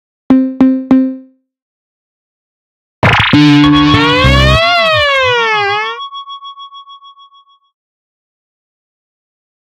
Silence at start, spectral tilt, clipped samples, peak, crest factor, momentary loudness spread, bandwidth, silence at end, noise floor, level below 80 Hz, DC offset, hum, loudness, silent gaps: 0.3 s; -6 dB/octave; 0.3%; 0 dBFS; 12 dB; 19 LU; 11 kHz; 2.75 s; -45 dBFS; -26 dBFS; under 0.1%; none; -9 LUFS; 1.62-3.02 s